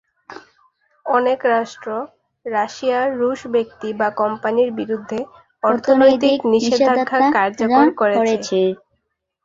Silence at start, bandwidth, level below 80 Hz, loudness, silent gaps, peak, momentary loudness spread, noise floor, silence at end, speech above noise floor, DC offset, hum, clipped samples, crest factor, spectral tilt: 0.3 s; 7.8 kHz; -62 dBFS; -18 LUFS; none; -2 dBFS; 13 LU; -72 dBFS; 0.7 s; 55 dB; under 0.1%; none; under 0.1%; 16 dB; -5 dB/octave